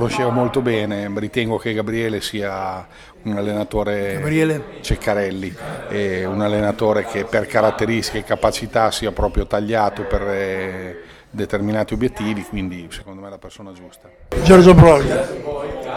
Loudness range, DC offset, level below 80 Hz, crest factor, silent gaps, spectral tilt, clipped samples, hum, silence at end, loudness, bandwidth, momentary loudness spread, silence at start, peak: 9 LU; under 0.1%; -32 dBFS; 18 dB; none; -6.5 dB/octave; under 0.1%; none; 0 s; -18 LUFS; 16 kHz; 15 LU; 0 s; 0 dBFS